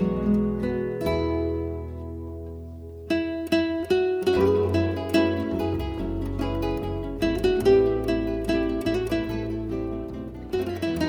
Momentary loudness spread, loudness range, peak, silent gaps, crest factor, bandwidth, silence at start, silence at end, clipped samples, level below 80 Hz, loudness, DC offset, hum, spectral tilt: 14 LU; 4 LU; -8 dBFS; none; 16 dB; 19.5 kHz; 0 s; 0 s; under 0.1%; -38 dBFS; -25 LUFS; under 0.1%; none; -7 dB/octave